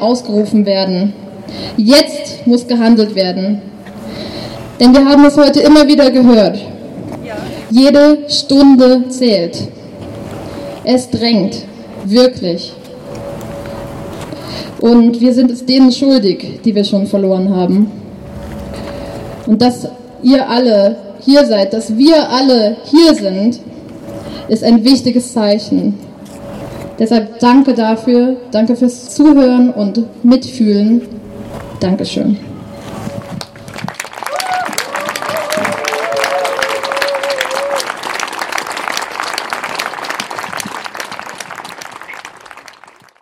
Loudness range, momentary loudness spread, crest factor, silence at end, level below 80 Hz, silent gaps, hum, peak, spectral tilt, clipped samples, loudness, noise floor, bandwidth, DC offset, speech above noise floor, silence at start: 10 LU; 19 LU; 12 dB; 0.6 s; -42 dBFS; none; none; 0 dBFS; -5 dB/octave; under 0.1%; -11 LUFS; -42 dBFS; 15.5 kHz; under 0.1%; 32 dB; 0 s